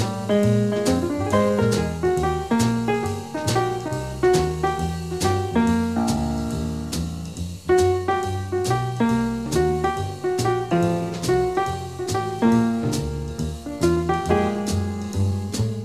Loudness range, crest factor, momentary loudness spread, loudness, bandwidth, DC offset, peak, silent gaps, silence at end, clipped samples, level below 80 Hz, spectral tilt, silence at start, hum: 2 LU; 14 dB; 8 LU; -23 LUFS; 15 kHz; 0.2%; -8 dBFS; none; 0 s; under 0.1%; -38 dBFS; -6 dB/octave; 0 s; none